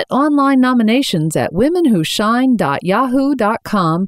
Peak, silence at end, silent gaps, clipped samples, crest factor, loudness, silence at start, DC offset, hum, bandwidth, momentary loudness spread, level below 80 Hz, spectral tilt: -4 dBFS; 0 s; none; under 0.1%; 10 dB; -14 LUFS; 0 s; under 0.1%; none; 15.5 kHz; 4 LU; -48 dBFS; -5.5 dB/octave